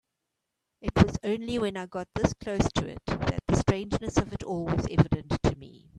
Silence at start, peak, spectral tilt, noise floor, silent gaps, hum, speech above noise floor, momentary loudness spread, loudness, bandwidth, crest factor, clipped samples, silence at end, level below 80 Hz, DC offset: 0.85 s; -4 dBFS; -6.5 dB/octave; -83 dBFS; none; none; 55 dB; 9 LU; -28 LUFS; 11 kHz; 24 dB; under 0.1%; 0 s; -42 dBFS; under 0.1%